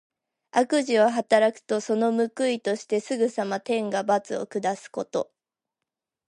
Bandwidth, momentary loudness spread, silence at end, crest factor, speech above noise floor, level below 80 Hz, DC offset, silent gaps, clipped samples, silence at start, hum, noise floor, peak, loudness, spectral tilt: 11.5 kHz; 9 LU; 1.05 s; 20 dB; 62 dB; -80 dBFS; under 0.1%; none; under 0.1%; 0.55 s; none; -86 dBFS; -6 dBFS; -25 LUFS; -4.5 dB/octave